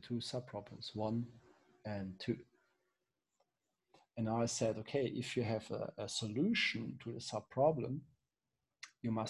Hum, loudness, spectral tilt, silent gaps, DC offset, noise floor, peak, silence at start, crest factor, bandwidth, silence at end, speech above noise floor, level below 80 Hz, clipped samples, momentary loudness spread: none; -39 LUFS; -5 dB/octave; none; under 0.1%; under -90 dBFS; -20 dBFS; 0.05 s; 20 dB; 12 kHz; 0 s; over 51 dB; -70 dBFS; under 0.1%; 13 LU